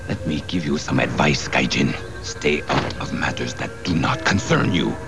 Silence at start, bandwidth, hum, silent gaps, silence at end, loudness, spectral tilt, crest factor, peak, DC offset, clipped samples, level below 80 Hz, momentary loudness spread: 0 s; 11 kHz; none; none; 0 s; -21 LUFS; -5 dB/octave; 18 dB; -4 dBFS; 1%; under 0.1%; -40 dBFS; 8 LU